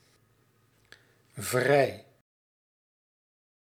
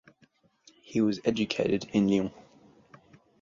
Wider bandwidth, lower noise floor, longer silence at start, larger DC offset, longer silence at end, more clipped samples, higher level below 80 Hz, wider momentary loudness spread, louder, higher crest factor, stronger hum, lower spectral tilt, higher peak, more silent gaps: first, 17 kHz vs 7.6 kHz; about the same, -67 dBFS vs -66 dBFS; first, 1.35 s vs 0.9 s; neither; first, 1.65 s vs 1.1 s; neither; second, -76 dBFS vs -62 dBFS; first, 24 LU vs 5 LU; about the same, -27 LUFS vs -28 LUFS; about the same, 24 dB vs 20 dB; neither; second, -4.5 dB/octave vs -6 dB/octave; about the same, -10 dBFS vs -10 dBFS; neither